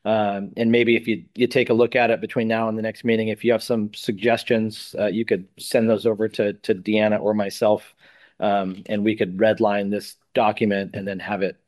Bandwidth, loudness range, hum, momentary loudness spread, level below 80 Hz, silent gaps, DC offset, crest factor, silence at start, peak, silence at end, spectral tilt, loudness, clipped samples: 12.5 kHz; 2 LU; none; 7 LU; -66 dBFS; none; under 0.1%; 18 dB; 0.05 s; -4 dBFS; 0.15 s; -6 dB/octave; -22 LUFS; under 0.1%